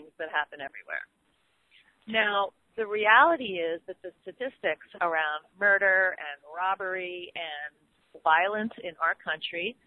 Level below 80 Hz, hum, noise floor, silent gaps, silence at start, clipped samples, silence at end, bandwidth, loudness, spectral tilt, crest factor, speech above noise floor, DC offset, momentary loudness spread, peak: -76 dBFS; none; -71 dBFS; none; 0 s; under 0.1%; 0.15 s; 11 kHz; -27 LUFS; -5.5 dB/octave; 22 dB; 42 dB; under 0.1%; 16 LU; -6 dBFS